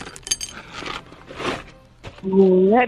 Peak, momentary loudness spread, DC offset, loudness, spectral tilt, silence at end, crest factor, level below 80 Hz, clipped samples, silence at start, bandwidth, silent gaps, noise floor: -4 dBFS; 23 LU; under 0.1%; -21 LUFS; -5 dB/octave; 0 s; 18 dB; -48 dBFS; under 0.1%; 0 s; 12.5 kHz; none; -42 dBFS